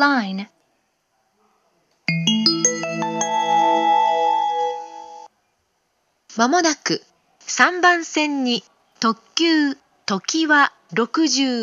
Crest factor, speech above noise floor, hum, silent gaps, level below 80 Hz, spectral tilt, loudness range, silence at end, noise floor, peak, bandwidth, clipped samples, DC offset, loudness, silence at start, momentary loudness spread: 20 dB; 50 dB; none; none; -80 dBFS; -2.5 dB/octave; 3 LU; 0 s; -68 dBFS; 0 dBFS; 11.5 kHz; under 0.1%; under 0.1%; -19 LUFS; 0 s; 13 LU